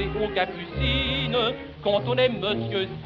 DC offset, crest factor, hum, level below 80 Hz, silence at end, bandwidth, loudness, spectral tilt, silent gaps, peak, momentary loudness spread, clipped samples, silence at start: under 0.1%; 18 dB; none; -38 dBFS; 0 s; 7.2 kHz; -25 LUFS; -3.5 dB/octave; none; -8 dBFS; 5 LU; under 0.1%; 0 s